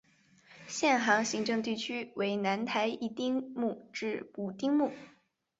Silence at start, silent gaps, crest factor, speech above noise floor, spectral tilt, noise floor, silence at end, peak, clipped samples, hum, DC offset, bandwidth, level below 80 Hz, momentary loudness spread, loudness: 0.5 s; none; 22 dB; 31 dB; -3.5 dB/octave; -63 dBFS; 0.5 s; -12 dBFS; under 0.1%; none; under 0.1%; 8 kHz; -78 dBFS; 10 LU; -32 LUFS